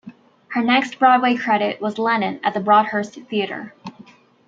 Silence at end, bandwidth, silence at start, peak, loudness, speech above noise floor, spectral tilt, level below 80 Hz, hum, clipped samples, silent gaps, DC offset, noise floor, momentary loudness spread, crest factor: 0.45 s; 7.8 kHz; 0.05 s; -2 dBFS; -19 LUFS; 29 dB; -5.5 dB/octave; -70 dBFS; none; under 0.1%; none; under 0.1%; -47 dBFS; 14 LU; 18 dB